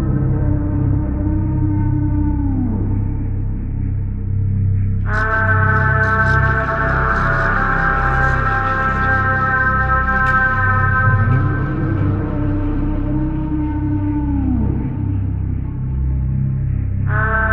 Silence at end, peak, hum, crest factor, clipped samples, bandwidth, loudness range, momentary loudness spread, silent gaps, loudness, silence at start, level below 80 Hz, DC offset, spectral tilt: 0 s; -2 dBFS; none; 14 dB; under 0.1%; 5.6 kHz; 5 LU; 7 LU; none; -17 LUFS; 0 s; -22 dBFS; under 0.1%; -9 dB/octave